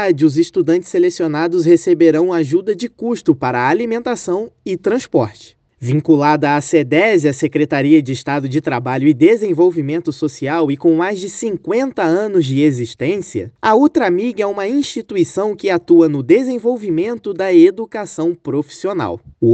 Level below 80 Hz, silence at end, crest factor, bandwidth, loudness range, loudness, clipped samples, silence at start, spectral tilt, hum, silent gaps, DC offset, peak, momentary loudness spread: -60 dBFS; 0 s; 14 dB; 8.8 kHz; 3 LU; -15 LUFS; under 0.1%; 0 s; -6.5 dB/octave; none; none; under 0.1%; 0 dBFS; 9 LU